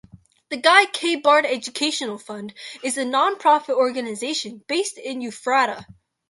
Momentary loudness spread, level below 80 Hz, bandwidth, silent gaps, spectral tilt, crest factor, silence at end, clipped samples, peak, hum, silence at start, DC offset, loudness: 16 LU; -68 dBFS; 11.5 kHz; none; -2 dB/octave; 20 dB; 0.35 s; under 0.1%; 0 dBFS; none; 0.15 s; under 0.1%; -20 LUFS